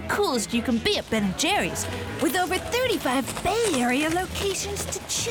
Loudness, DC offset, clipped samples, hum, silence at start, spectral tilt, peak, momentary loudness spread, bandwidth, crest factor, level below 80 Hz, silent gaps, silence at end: -25 LUFS; under 0.1%; under 0.1%; none; 0 s; -3 dB/octave; -10 dBFS; 5 LU; over 20 kHz; 14 dB; -46 dBFS; none; 0 s